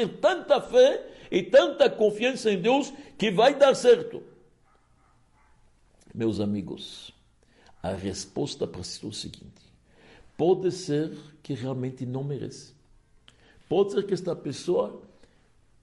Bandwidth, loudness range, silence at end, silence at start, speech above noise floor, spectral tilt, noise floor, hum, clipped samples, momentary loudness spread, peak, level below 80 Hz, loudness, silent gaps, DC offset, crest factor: 11.5 kHz; 13 LU; 0.8 s; 0 s; 37 dB; -5 dB/octave; -62 dBFS; none; under 0.1%; 17 LU; -8 dBFS; -62 dBFS; -25 LUFS; none; under 0.1%; 18 dB